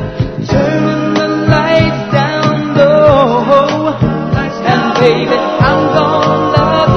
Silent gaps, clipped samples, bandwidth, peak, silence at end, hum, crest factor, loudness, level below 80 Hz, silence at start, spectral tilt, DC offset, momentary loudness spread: none; 0.3%; 6.6 kHz; 0 dBFS; 0 s; none; 10 dB; -11 LUFS; -32 dBFS; 0 s; -7 dB/octave; under 0.1%; 6 LU